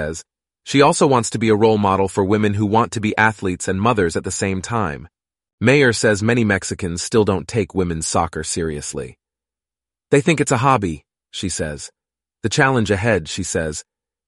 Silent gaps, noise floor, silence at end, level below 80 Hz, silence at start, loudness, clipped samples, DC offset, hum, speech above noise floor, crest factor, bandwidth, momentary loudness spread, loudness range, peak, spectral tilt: 5.53-5.58 s; under -90 dBFS; 0.45 s; -44 dBFS; 0 s; -18 LUFS; under 0.1%; under 0.1%; none; over 72 dB; 18 dB; 11.5 kHz; 13 LU; 4 LU; -2 dBFS; -5 dB/octave